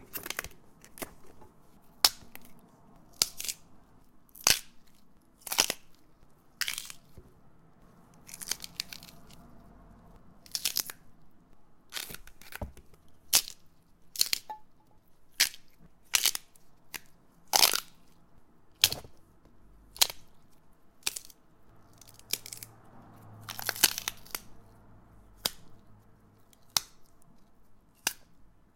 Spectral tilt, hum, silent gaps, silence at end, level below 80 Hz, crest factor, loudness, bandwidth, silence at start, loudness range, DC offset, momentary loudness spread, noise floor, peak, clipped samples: 0.5 dB/octave; none; none; 0.3 s; -60 dBFS; 34 dB; -30 LUFS; 17 kHz; 0 s; 10 LU; under 0.1%; 22 LU; -59 dBFS; -2 dBFS; under 0.1%